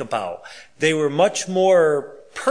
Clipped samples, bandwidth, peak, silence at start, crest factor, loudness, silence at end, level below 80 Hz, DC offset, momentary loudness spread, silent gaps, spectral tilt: under 0.1%; 10.5 kHz; -4 dBFS; 0 s; 16 dB; -19 LUFS; 0 s; -68 dBFS; 0.3%; 16 LU; none; -4 dB/octave